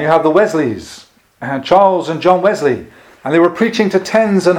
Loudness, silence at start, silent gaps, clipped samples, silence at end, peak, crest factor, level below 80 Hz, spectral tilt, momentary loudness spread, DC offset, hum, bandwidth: -13 LUFS; 0 s; none; 0.1%; 0 s; 0 dBFS; 14 dB; -52 dBFS; -6 dB/octave; 13 LU; under 0.1%; none; 15.5 kHz